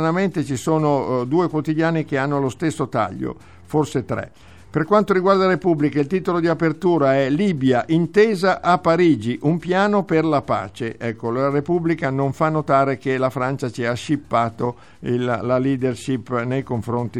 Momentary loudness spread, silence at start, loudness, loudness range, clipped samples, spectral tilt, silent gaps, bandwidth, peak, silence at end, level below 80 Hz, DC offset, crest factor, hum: 8 LU; 0 s; -20 LUFS; 5 LU; under 0.1%; -7 dB/octave; none; 13.5 kHz; -2 dBFS; 0 s; -54 dBFS; 0.4%; 18 dB; none